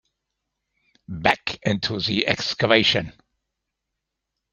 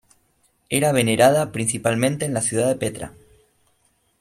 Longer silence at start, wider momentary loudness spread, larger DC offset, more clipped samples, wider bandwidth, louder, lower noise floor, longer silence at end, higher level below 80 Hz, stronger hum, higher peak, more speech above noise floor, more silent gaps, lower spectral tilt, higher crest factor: first, 1.1 s vs 0.7 s; second, 8 LU vs 11 LU; neither; neither; second, 10.5 kHz vs 15 kHz; about the same, -21 LUFS vs -20 LUFS; first, -82 dBFS vs -65 dBFS; first, 1.4 s vs 1.1 s; about the same, -56 dBFS vs -56 dBFS; neither; first, 0 dBFS vs -4 dBFS; first, 60 dB vs 45 dB; neither; about the same, -4.5 dB/octave vs -4.5 dB/octave; about the same, 24 dB vs 20 dB